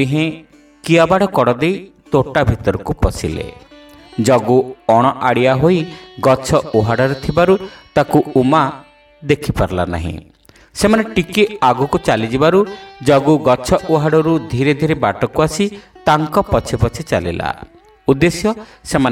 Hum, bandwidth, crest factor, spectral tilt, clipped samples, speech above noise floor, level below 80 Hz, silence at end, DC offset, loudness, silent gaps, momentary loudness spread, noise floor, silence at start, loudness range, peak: none; 17 kHz; 14 dB; -6 dB/octave; under 0.1%; 26 dB; -34 dBFS; 0 s; under 0.1%; -15 LUFS; none; 10 LU; -40 dBFS; 0 s; 3 LU; 0 dBFS